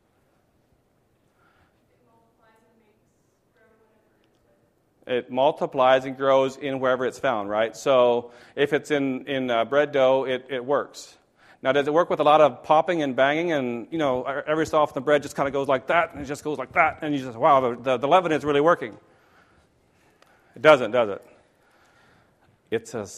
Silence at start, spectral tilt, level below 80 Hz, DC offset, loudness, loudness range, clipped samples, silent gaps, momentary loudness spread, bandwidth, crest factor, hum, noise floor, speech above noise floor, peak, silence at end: 5.05 s; -5 dB/octave; -62 dBFS; under 0.1%; -22 LUFS; 4 LU; under 0.1%; none; 10 LU; 13.5 kHz; 24 dB; none; -66 dBFS; 44 dB; 0 dBFS; 0 s